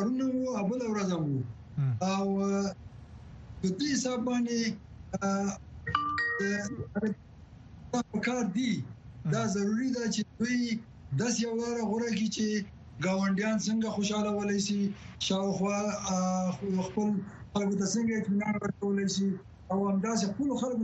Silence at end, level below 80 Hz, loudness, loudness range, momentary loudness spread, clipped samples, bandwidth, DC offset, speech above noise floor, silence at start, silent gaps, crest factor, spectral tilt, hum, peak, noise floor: 0 s; -58 dBFS; -31 LUFS; 2 LU; 7 LU; under 0.1%; 8.4 kHz; under 0.1%; 20 dB; 0 s; none; 20 dB; -5 dB/octave; none; -12 dBFS; -50 dBFS